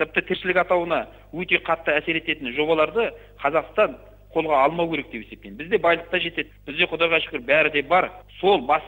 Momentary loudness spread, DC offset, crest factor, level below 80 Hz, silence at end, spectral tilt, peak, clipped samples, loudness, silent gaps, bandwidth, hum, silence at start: 11 LU; under 0.1%; 20 dB; -50 dBFS; 0 s; -6.5 dB/octave; -4 dBFS; under 0.1%; -22 LUFS; none; 16 kHz; none; 0 s